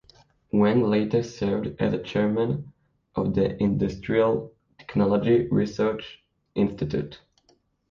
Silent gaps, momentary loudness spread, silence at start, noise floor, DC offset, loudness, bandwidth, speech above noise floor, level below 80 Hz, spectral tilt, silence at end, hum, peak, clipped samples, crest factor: none; 11 LU; 0.55 s; -65 dBFS; under 0.1%; -25 LUFS; 7 kHz; 41 dB; -50 dBFS; -8 dB/octave; 0.75 s; none; -10 dBFS; under 0.1%; 16 dB